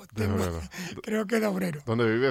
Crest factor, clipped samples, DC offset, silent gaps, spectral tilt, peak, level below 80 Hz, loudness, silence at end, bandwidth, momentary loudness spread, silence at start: 16 dB; under 0.1%; under 0.1%; none; -6 dB/octave; -12 dBFS; -54 dBFS; -29 LUFS; 0 s; 16 kHz; 10 LU; 0 s